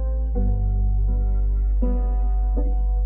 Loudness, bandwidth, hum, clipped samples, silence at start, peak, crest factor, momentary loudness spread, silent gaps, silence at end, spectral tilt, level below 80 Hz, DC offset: -24 LUFS; 1.5 kHz; 50 Hz at -25 dBFS; under 0.1%; 0 s; -12 dBFS; 8 dB; 1 LU; none; 0 s; -14 dB/octave; -20 dBFS; under 0.1%